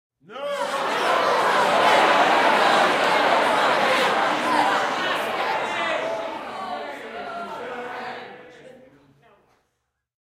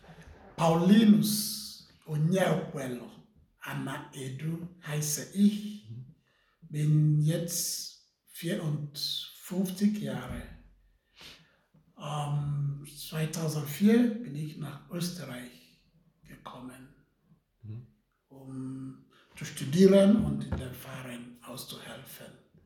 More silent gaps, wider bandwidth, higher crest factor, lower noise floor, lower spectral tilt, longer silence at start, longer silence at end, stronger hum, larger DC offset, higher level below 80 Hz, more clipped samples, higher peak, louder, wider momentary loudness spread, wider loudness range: neither; second, 16 kHz vs 19 kHz; about the same, 18 dB vs 22 dB; first, -76 dBFS vs -68 dBFS; second, -2.5 dB/octave vs -5.5 dB/octave; first, 0.3 s vs 0.1 s; first, 1.65 s vs 0.35 s; neither; neither; second, -68 dBFS vs -58 dBFS; neither; first, -4 dBFS vs -8 dBFS; first, -20 LUFS vs -29 LUFS; second, 16 LU vs 23 LU; about the same, 16 LU vs 15 LU